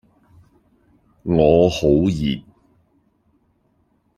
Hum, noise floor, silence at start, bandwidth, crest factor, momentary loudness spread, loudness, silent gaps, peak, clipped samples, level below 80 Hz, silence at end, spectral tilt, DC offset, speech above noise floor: none; -63 dBFS; 1.25 s; 13 kHz; 20 dB; 14 LU; -17 LUFS; none; -2 dBFS; under 0.1%; -42 dBFS; 1.75 s; -7 dB/octave; under 0.1%; 47 dB